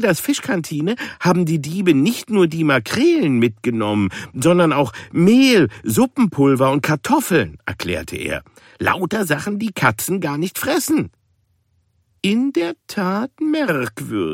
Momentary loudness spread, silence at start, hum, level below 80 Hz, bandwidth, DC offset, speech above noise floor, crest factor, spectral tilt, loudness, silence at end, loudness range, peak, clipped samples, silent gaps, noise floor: 9 LU; 0 s; none; -52 dBFS; 16.5 kHz; under 0.1%; 46 dB; 16 dB; -5.5 dB/octave; -18 LUFS; 0 s; 6 LU; -2 dBFS; under 0.1%; none; -63 dBFS